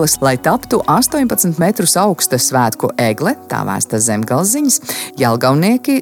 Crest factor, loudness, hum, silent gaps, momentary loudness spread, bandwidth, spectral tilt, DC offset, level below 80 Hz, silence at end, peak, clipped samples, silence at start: 14 dB; -14 LUFS; none; none; 5 LU; 17.5 kHz; -4 dB/octave; under 0.1%; -48 dBFS; 0 s; 0 dBFS; under 0.1%; 0 s